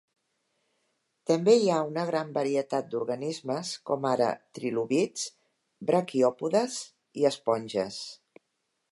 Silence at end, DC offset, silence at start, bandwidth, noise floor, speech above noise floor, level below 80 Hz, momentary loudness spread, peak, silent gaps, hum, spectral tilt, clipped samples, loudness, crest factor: 0.75 s; under 0.1%; 1.3 s; 11.5 kHz; -79 dBFS; 52 dB; -78 dBFS; 12 LU; -10 dBFS; none; none; -5 dB/octave; under 0.1%; -28 LUFS; 20 dB